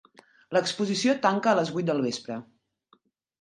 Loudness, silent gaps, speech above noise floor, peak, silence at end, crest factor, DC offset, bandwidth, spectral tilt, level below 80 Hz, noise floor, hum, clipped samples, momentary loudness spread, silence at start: -26 LUFS; none; 40 dB; -6 dBFS; 1 s; 20 dB; under 0.1%; 11.5 kHz; -4.5 dB/octave; -74 dBFS; -66 dBFS; none; under 0.1%; 11 LU; 0.5 s